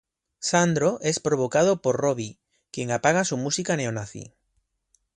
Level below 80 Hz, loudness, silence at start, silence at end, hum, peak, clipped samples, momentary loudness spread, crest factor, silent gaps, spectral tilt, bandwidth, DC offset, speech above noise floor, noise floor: -62 dBFS; -24 LUFS; 0.4 s; 0.9 s; none; -6 dBFS; under 0.1%; 13 LU; 18 dB; none; -4.5 dB/octave; 11 kHz; under 0.1%; 49 dB; -73 dBFS